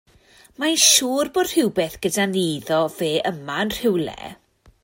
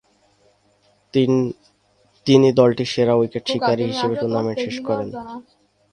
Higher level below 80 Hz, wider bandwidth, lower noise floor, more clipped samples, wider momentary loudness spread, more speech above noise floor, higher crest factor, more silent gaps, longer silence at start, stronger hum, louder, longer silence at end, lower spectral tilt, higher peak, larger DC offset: about the same, -54 dBFS vs -58 dBFS; first, 16.5 kHz vs 10 kHz; second, -53 dBFS vs -60 dBFS; neither; second, 12 LU vs 15 LU; second, 32 dB vs 42 dB; about the same, 20 dB vs 20 dB; neither; second, 0.6 s vs 1.15 s; neither; about the same, -20 LUFS vs -19 LUFS; about the same, 0.5 s vs 0.5 s; second, -2.5 dB/octave vs -6.5 dB/octave; about the same, -2 dBFS vs 0 dBFS; neither